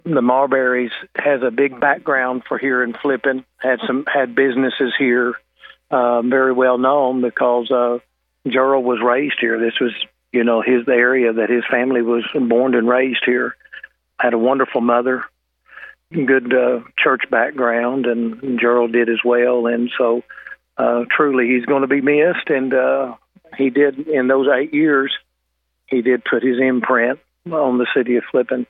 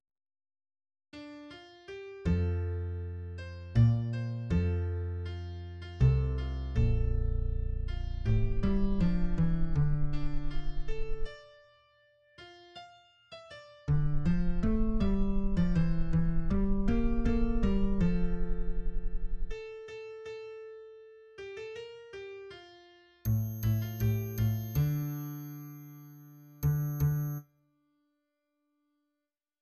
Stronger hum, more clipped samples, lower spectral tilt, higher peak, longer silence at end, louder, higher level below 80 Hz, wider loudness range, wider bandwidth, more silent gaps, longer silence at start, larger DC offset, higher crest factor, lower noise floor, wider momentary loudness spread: neither; neither; about the same, -8.5 dB/octave vs -8.5 dB/octave; first, 0 dBFS vs -14 dBFS; second, 0.05 s vs 2.2 s; first, -17 LUFS vs -33 LUFS; second, -70 dBFS vs -34 dBFS; second, 2 LU vs 12 LU; second, 4 kHz vs 13 kHz; neither; second, 0.05 s vs 1.15 s; neither; about the same, 16 dB vs 16 dB; second, -72 dBFS vs -88 dBFS; second, 7 LU vs 19 LU